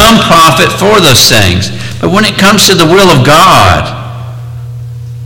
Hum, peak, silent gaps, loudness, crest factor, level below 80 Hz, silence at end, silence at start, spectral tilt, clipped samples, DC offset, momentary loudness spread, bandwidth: none; 0 dBFS; none; -4 LUFS; 6 dB; -28 dBFS; 0 s; 0 s; -3.5 dB/octave; 3%; under 0.1%; 19 LU; over 20 kHz